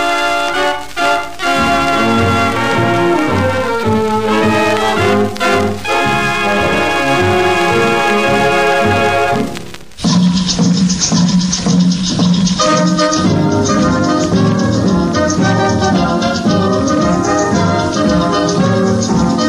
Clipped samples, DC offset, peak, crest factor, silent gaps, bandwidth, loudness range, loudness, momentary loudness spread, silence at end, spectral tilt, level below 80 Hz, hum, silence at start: under 0.1%; under 0.1%; 0 dBFS; 12 dB; none; 15.5 kHz; 1 LU; -12 LUFS; 3 LU; 0 s; -5 dB/octave; -36 dBFS; none; 0 s